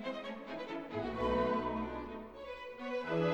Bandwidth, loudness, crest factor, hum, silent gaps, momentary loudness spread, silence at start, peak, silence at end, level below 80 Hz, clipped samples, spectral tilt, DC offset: 19 kHz; -39 LUFS; 16 dB; none; none; 13 LU; 0 s; -22 dBFS; 0 s; -56 dBFS; under 0.1%; -7 dB/octave; under 0.1%